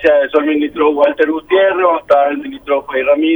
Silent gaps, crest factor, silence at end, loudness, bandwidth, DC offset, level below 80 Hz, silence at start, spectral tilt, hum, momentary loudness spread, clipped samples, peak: none; 12 dB; 0 s; -13 LUFS; over 20 kHz; under 0.1%; -50 dBFS; 0 s; -6 dB/octave; none; 6 LU; under 0.1%; 0 dBFS